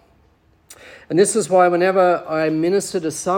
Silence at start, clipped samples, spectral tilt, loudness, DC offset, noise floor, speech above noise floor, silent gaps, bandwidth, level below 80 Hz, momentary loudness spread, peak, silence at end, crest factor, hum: 0.7 s; under 0.1%; -4.5 dB/octave; -17 LUFS; under 0.1%; -56 dBFS; 40 dB; none; 17.5 kHz; -60 dBFS; 7 LU; -2 dBFS; 0 s; 16 dB; none